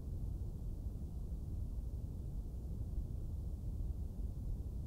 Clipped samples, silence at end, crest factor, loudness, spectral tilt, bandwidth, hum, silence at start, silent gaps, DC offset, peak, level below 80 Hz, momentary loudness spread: under 0.1%; 0 s; 12 dB; -46 LUFS; -9 dB/octave; 15.5 kHz; none; 0 s; none; under 0.1%; -30 dBFS; -44 dBFS; 2 LU